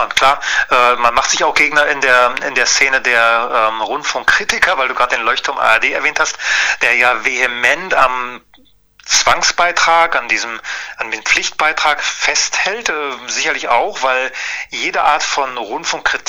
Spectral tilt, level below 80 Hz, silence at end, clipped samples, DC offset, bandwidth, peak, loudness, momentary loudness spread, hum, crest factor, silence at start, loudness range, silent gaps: 0 dB/octave; -44 dBFS; 0.05 s; under 0.1%; under 0.1%; over 20 kHz; 0 dBFS; -13 LUFS; 8 LU; none; 14 dB; 0 s; 4 LU; none